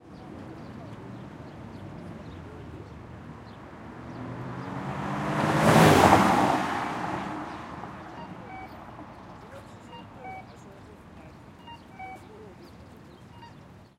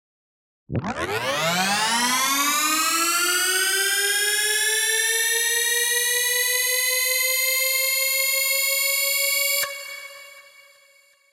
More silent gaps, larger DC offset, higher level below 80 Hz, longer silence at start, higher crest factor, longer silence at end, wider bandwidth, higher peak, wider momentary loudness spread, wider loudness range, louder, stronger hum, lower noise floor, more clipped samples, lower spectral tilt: neither; neither; about the same, -56 dBFS vs -60 dBFS; second, 0.05 s vs 0.7 s; first, 28 dB vs 14 dB; second, 0.2 s vs 0.9 s; about the same, 16.5 kHz vs 16.5 kHz; first, -2 dBFS vs -10 dBFS; first, 27 LU vs 7 LU; first, 22 LU vs 2 LU; second, -24 LUFS vs -19 LUFS; neither; second, -50 dBFS vs -57 dBFS; neither; first, -5.5 dB/octave vs 0 dB/octave